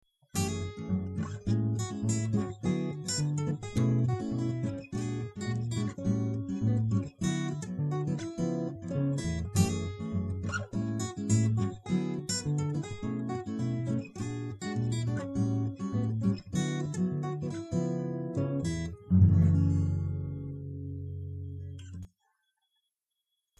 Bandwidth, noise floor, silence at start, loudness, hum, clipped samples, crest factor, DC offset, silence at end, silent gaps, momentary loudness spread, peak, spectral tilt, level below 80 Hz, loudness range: 12.5 kHz; -85 dBFS; 0.35 s; -32 LUFS; none; under 0.1%; 20 dB; under 0.1%; 1.55 s; none; 9 LU; -10 dBFS; -6.5 dB/octave; -52 dBFS; 5 LU